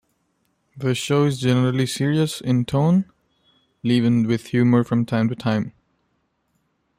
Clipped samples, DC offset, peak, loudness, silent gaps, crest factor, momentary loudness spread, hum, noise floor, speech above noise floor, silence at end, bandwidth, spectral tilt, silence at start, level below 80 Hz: under 0.1%; under 0.1%; -6 dBFS; -20 LUFS; none; 14 dB; 7 LU; none; -69 dBFS; 50 dB; 1.3 s; 15.5 kHz; -6.5 dB/octave; 0.75 s; -58 dBFS